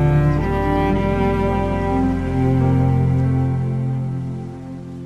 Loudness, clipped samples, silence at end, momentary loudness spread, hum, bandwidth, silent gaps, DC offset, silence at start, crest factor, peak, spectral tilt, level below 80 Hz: -19 LUFS; under 0.1%; 0 s; 10 LU; none; 7 kHz; none; 0.3%; 0 s; 14 dB; -4 dBFS; -9.5 dB/octave; -30 dBFS